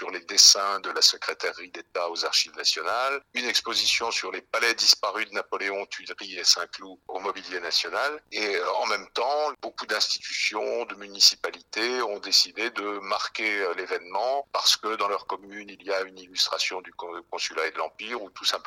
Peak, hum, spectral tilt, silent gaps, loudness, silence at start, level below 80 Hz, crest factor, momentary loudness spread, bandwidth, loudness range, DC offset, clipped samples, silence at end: -2 dBFS; none; 1.5 dB/octave; none; -24 LUFS; 0 s; -72 dBFS; 24 dB; 15 LU; 18 kHz; 4 LU; under 0.1%; under 0.1%; 0.05 s